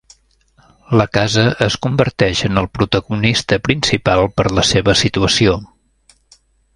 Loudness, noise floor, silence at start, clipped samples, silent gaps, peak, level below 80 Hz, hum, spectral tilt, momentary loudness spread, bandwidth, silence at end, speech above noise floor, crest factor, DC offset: -15 LUFS; -55 dBFS; 0.9 s; under 0.1%; none; 0 dBFS; -36 dBFS; none; -4.5 dB/octave; 4 LU; 11.5 kHz; 1.1 s; 40 dB; 16 dB; under 0.1%